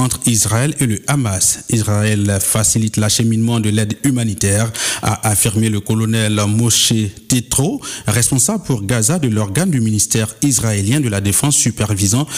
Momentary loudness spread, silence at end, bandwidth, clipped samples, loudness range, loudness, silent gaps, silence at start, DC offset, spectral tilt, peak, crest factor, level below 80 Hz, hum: 5 LU; 0 s; 16 kHz; under 0.1%; 1 LU; -15 LUFS; none; 0 s; under 0.1%; -4 dB/octave; -4 dBFS; 10 dB; -42 dBFS; none